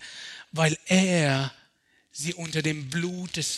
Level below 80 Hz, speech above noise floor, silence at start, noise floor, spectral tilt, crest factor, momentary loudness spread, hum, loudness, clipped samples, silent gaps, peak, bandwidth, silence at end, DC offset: -66 dBFS; 40 dB; 0 s; -65 dBFS; -4.5 dB/octave; 20 dB; 14 LU; none; -26 LUFS; under 0.1%; none; -8 dBFS; 13 kHz; 0 s; under 0.1%